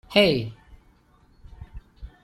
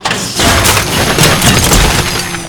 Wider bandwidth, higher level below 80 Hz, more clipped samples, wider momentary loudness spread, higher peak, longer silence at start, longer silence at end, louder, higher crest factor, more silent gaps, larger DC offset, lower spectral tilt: second, 15.5 kHz vs over 20 kHz; second, -46 dBFS vs -20 dBFS; second, under 0.1% vs 0.6%; first, 27 LU vs 5 LU; second, -4 dBFS vs 0 dBFS; about the same, 0.1 s vs 0 s; first, 0.15 s vs 0 s; second, -22 LUFS vs -8 LUFS; first, 22 dB vs 10 dB; neither; neither; first, -5.5 dB/octave vs -3 dB/octave